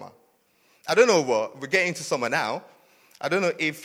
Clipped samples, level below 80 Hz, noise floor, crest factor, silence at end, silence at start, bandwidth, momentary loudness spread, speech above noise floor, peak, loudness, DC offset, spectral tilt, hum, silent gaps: under 0.1%; -74 dBFS; -64 dBFS; 20 dB; 0 s; 0 s; 16 kHz; 13 LU; 40 dB; -4 dBFS; -23 LUFS; under 0.1%; -3.5 dB/octave; none; none